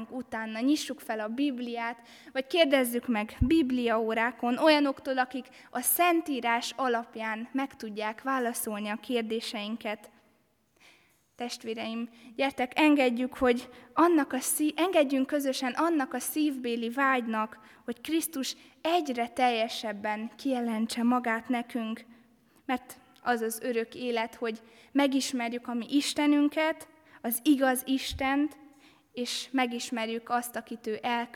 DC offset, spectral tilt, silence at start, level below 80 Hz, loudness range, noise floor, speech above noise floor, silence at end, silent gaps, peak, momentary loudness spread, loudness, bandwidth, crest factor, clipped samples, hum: under 0.1%; -3.5 dB/octave; 0 s; -54 dBFS; 7 LU; -69 dBFS; 40 dB; 0.1 s; none; -10 dBFS; 12 LU; -29 LUFS; 18.5 kHz; 20 dB; under 0.1%; none